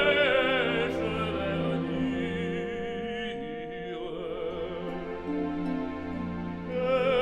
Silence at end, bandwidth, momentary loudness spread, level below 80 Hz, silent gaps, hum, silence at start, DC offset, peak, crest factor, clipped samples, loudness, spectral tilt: 0 s; 9.6 kHz; 11 LU; -50 dBFS; none; none; 0 s; under 0.1%; -12 dBFS; 18 dB; under 0.1%; -30 LUFS; -6.5 dB/octave